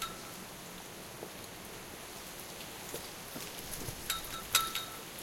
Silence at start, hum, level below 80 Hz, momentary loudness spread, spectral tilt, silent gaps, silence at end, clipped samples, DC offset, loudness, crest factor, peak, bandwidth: 0 s; none; -58 dBFS; 15 LU; -1.5 dB/octave; none; 0 s; under 0.1%; under 0.1%; -39 LUFS; 30 dB; -10 dBFS; 17 kHz